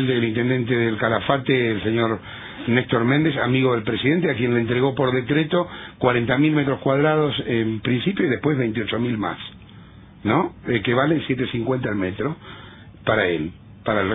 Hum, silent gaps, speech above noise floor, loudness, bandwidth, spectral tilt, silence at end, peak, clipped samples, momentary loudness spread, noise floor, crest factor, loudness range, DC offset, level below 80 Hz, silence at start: none; none; 23 dB; -21 LUFS; 3.9 kHz; -10 dB/octave; 0 s; -2 dBFS; under 0.1%; 9 LU; -44 dBFS; 18 dB; 3 LU; under 0.1%; -52 dBFS; 0 s